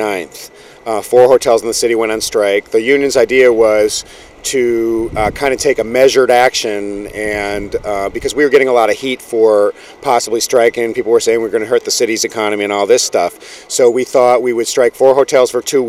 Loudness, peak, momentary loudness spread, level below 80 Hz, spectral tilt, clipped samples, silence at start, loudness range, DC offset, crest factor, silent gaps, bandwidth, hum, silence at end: -13 LUFS; 0 dBFS; 10 LU; -42 dBFS; -3 dB/octave; 0.1%; 0 s; 2 LU; under 0.1%; 12 dB; none; 16 kHz; none; 0 s